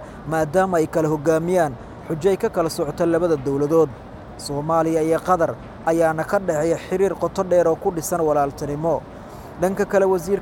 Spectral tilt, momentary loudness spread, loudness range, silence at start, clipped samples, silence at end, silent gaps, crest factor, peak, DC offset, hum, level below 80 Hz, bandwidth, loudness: -6 dB/octave; 8 LU; 1 LU; 0 s; under 0.1%; 0 s; none; 16 dB; -4 dBFS; under 0.1%; none; -46 dBFS; 17 kHz; -21 LUFS